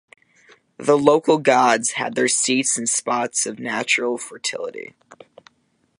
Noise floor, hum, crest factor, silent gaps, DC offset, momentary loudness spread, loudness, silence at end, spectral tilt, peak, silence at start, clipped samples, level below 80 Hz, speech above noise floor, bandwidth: -65 dBFS; none; 20 dB; none; under 0.1%; 11 LU; -19 LUFS; 1.15 s; -2.5 dB/octave; 0 dBFS; 0.8 s; under 0.1%; -68 dBFS; 46 dB; 11.5 kHz